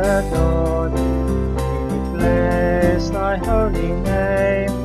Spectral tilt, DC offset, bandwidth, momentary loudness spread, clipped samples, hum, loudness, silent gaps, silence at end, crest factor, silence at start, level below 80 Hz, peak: -7.5 dB/octave; under 0.1%; 14 kHz; 5 LU; under 0.1%; none; -19 LUFS; none; 0 s; 14 dB; 0 s; -24 dBFS; -4 dBFS